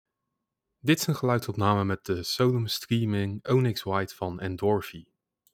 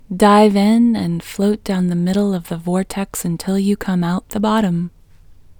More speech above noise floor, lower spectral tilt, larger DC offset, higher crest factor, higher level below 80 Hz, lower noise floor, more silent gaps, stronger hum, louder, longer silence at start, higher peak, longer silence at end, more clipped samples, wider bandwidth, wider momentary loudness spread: first, 57 dB vs 27 dB; about the same, -5.5 dB/octave vs -6.5 dB/octave; neither; about the same, 20 dB vs 16 dB; second, -62 dBFS vs -44 dBFS; first, -84 dBFS vs -43 dBFS; neither; neither; second, -27 LUFS vs -17 LUFS; first, 0.85 s vs 0.1 s; second, -8 dBFS vs 0 dBFS; first, 0.5 s vs 0.1 s; neither; second, 18 kHz vs 20 kHz; second, 7 LU vs 11 LU